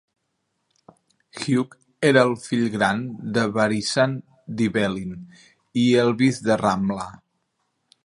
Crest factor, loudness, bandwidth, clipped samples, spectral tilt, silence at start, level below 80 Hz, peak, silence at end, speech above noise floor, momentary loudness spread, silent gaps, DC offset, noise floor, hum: 22 dB; -22 LUFS; 11.5 kHz; under 0.1%; -5.5 dB/octave; 1.35 s; -58 dBFS; -2 dBFS; 0.9 s; 53 dB; 15 LU; none; under 0.1%; -75 dBFS; none